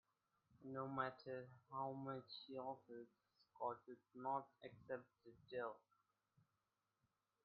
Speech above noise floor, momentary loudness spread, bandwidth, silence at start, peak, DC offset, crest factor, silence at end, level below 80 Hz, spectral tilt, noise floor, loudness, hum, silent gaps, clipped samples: over 39 dB; 14 LU; 5 kHz; 0.5 s; -28 dBFS; under 0.1%; 24 dB; 1.65 s; -90 dBFS; -4.5 dB/octave; under -90 dBFS; -51 LUFS; none; none; under 0.1%